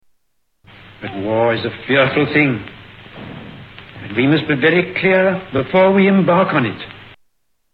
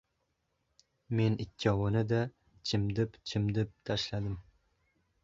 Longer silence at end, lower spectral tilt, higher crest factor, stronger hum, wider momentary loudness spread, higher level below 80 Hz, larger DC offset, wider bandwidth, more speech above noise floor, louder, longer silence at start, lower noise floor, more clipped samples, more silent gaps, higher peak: second, 0.7 s vs 0.85 s; first, -9 dB/octave vs -6.5 dB/octave; about the same, 16 dB vs 20 dB; neither; first, 22 LU vs 8 LU; about the same, -52 dBFS vs -54 dBFS; neither; second, 5 kHz vs 7.6 kHz; first, 54 dB vs 48 dB; first, -15 LUFS vs -33 LUFS; about the same, 1 s vs 1.1 s; second, -69 dBFS vs -80 dBFS; neither; neither; first, -2 dBFS vs -14 dBFS